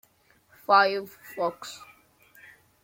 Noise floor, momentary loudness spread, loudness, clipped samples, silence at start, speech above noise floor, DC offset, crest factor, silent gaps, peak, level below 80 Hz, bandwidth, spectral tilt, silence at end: -63 dBFS; 21 LU; -24 LUFS; under 0.1%; 0.7 s; 37 dB; under 0.1%; 22 dB; none; -6 dBFS; -76 dBFS; 16.5 kHz; -3 dB/octave; 1.05 s